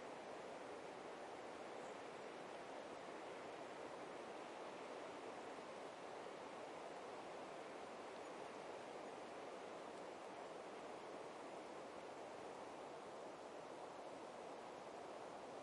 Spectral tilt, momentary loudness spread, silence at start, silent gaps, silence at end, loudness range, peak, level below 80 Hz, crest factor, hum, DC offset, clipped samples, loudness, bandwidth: -3.5 dB/octave; 1 LU; 0 s; none; 0 s; 1 LU; -40 dBFS; -90 dBFS; 14 dB; none; under 0.1%; under 0.1%; -54 LUFS; 11 kHz